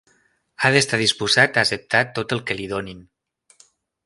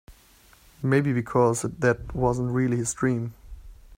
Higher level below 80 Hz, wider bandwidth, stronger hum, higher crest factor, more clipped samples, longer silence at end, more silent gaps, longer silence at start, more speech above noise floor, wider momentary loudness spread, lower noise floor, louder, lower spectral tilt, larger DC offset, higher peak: second, -56 dBFS vs -46 dBFS; second, 11.5 kHz vs 16 kHz; neither; about the same, 22 dB vs 18 dB; neither; first, 1.05 s vs 0.25 s; neither; first, 0.6 s vs 0.1 s; first, 42 dB vs 32 dB; first, 11 LU vs 5 LU; first, -63 dBFS vs -56 dBFS; first, -19 LUFS vs -25 LUFS; second, -3 dB/octave vs -6.5 dB/octave; neither; first, 0 dBFS vs -6 dBFS